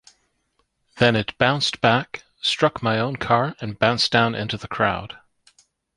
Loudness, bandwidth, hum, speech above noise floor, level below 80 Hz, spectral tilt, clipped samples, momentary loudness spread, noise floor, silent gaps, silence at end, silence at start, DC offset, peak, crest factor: -21 LUFS; 11.5 kHz; none; 49 dB; -52 dBFS; -5 dB/octave; under 0.1%; 9 LU; -70 dBFS; none; 0.85 s; 0.95 s; under 0.1%; -2 dBFS; 20 dB